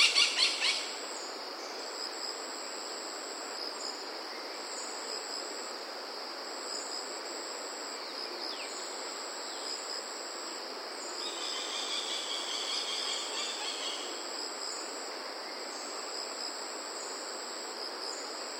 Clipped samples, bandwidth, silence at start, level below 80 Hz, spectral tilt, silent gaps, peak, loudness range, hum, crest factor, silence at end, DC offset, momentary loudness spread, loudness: under 0.1%; 16 kHz; 0 s; under -90 dBFS; 2 dB/octave; none; -12 dBFS; 4 LU; none; 26 dB; 0 s; under 0.1%; 7 LU; -35 LUFS